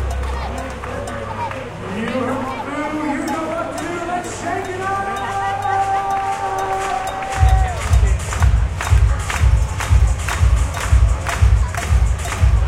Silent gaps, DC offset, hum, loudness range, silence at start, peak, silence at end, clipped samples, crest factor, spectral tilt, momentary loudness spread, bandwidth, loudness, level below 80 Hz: none; under 0.1%; none; 6 LU; 0 s; 0 dBFS; 0 s; under 0.1%; 16 dB; -5.5 dB/octave; 9 LU; 13.5 kHz; -19 LUFS; -20 dBFS